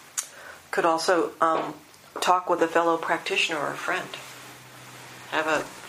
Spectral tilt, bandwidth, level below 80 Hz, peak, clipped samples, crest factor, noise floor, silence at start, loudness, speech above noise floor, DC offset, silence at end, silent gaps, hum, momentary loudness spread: -2.5 dB/octave; 15.5 kHz; -72 dBFS; -6 dBFS; under 0.1%; 22 dB; -45 dBFS; 0 s; -25 LUFS; 20 dB; under 0.1%; 0 s; none; none; 20 LU